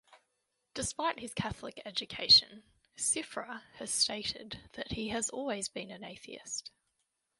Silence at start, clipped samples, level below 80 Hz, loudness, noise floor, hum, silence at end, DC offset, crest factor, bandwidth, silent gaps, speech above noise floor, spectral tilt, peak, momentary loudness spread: 0.1 s; under 0.1%; -62 dBFS; -31 LUFS; -82 dBFS; none; 0.7 s; under 0.1%; 26 dB; 12 kHz; none; 47 dB; -1.5 dB/octave; -10 dBFS; 23 LU